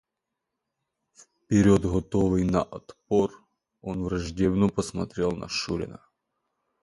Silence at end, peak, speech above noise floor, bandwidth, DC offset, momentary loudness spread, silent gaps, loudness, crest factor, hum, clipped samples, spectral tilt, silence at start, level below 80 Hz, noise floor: 0.85 s; -8 dBFS; 59 dB; 11.5 kHz; under 0.1%; 13 LU; none; -26 LUFS; 20 dB; none; under 0.1%; -6.5 dB/octave; 1.5 s; -46 dBFS; -84 dBFS